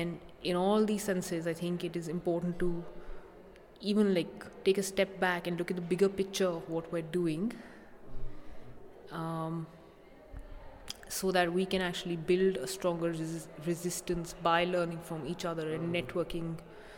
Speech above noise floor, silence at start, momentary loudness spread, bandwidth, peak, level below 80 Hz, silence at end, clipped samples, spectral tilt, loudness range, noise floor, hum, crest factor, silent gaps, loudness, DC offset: 22 dB; 0 s; 22 LU; 18.5 kHz; -14 dBFS; -52 dBFS; 0 s; under 0.1%; -5 dB/octave; 7 LU; -55 dBFS; none; 20 dB; none; -33 LUFS; under 0.1%